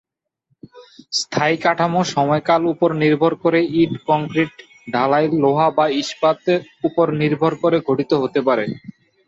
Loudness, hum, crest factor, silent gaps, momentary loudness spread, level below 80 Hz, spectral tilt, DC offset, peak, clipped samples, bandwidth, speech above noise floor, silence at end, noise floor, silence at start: -18 LUFS; none; 16 dB; none; 6 LU; -60 dBFS; -5.5 dB/octave; under 0.1%; -2 dBFS; under 0.1%; 8 kHz; 51 dB; 0.4 s; -68 dBFS; 0.75 s